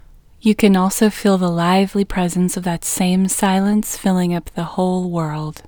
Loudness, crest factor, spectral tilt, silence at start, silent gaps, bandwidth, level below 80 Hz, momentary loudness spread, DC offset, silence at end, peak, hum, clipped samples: -17 LUFS; 16 dB; -5.5 dB/octave; 0.45 s; none; over 20 kHz; -42 dBFS; 7 LU; under 0.1%; 0.1 s; 0 dBFS; none; under 0.1%